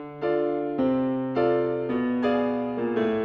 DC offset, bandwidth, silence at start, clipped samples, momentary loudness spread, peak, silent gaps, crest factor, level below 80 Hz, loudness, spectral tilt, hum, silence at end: under 0.1%; 5.4 kHz; 0 s; under 0.1%; 3 LU; -12 dBFS; none; 12 dB; -58 dBFS; -25 LUFS; -9 dB/octave; none; 0 s